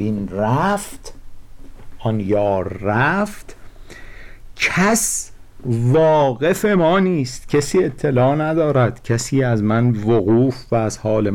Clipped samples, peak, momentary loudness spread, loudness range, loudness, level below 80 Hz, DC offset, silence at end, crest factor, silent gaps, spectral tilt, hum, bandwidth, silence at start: under 0.1%; -8 dBFS; 8 LU; 5 LU; -18 LUFS; -40 dBFS; under 0.1%; 0 s; 10 dB; none; -5.5 dB/octave; none; 18 kHz; 0 s